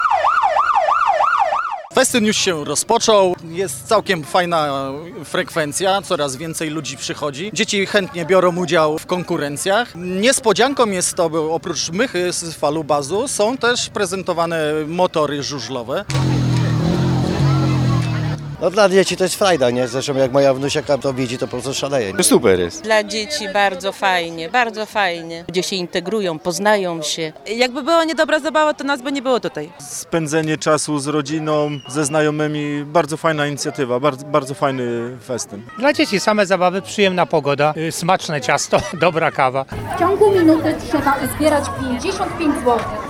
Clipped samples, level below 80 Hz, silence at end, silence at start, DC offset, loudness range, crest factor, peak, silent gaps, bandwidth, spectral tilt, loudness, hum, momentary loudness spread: under 0.1%; -48 dBFS; 0 s; 0 s; under 0.1%; 3 LU; 18 dB; 0 dBFS; none; 17 kHz; -4.5 dB/octave; -18 LUFS; none; 8 LU